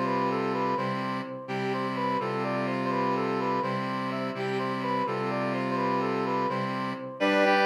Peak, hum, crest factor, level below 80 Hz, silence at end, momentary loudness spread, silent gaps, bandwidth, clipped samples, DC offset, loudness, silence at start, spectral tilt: -12 dBFS; none; 16 dB; -78 dBFS; 0 s; 4 LU; none; 13 kHz; under 0.1%; under 0.1%; -29 LUFS; 0 s; -6.5 dB/octave